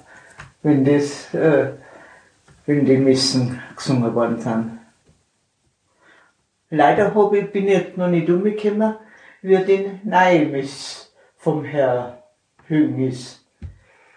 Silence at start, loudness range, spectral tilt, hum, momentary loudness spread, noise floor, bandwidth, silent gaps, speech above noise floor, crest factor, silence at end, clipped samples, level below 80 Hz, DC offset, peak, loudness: 0.4 s; 5 LU; -6 dB/octave; none; 16 LU; -67 dBFS; 10.5 kHz; none; 49 dB; 18 dB; 0.45 s; under 0.1%; -56 dBFS; under 0.1%; -2 dBFS; -19 LUFS